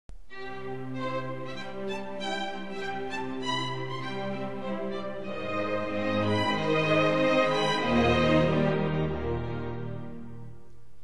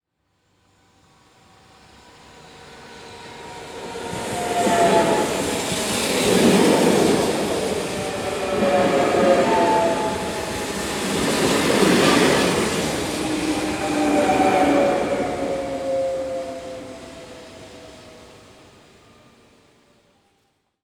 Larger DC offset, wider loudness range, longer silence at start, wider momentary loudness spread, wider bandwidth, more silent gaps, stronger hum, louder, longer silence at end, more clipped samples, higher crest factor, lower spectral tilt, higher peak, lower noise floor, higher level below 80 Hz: first, 1% vs under 0.1%; second, 9 LU vs 13 LU; second, 0.1 s vs 2.45 s; second, 15 LU vs 21 LU; second, 11.5 kHz vs over 20 kHz; neither; neither; second, -29 LUFS vs -20 LUFS; second, 0.05 s vs 2.55 s; neither; about the same, 18 dB vs 18 dB; first, -6 dB/octave vs -4 dB/octave; second, -12 dBFS vs -4 dBFS; second, -52 dBFS vs -69 dBFS; about the same, -48 dBFS vs -48 dBFS